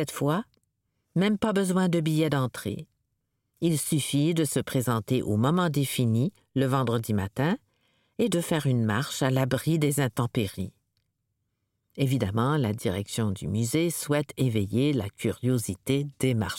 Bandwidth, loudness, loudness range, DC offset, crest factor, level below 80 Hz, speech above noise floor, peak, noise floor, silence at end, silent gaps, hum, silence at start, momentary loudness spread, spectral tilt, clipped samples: 17 kHz; -27 LUFS; 3 LU; under 0.1%; 16 dB; -60 dBFS; 53 dB; -10 dBFS; -79 dBFS; 0 s; none; none; 0 s; 6 LU; -6 dB/octave; under 0.1%